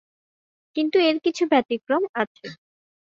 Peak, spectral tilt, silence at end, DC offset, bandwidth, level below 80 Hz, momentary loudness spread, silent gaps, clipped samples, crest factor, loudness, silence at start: -6 dBFS; -4 dB/octave; 0.6 s; under 0.1%; 7.6 kHz; -70 dBFS; 13 LU; 2.09-2.14 s, 2.27-2.35 s; under 0.1%; 18 dB; -23 LUFS; 0.75 s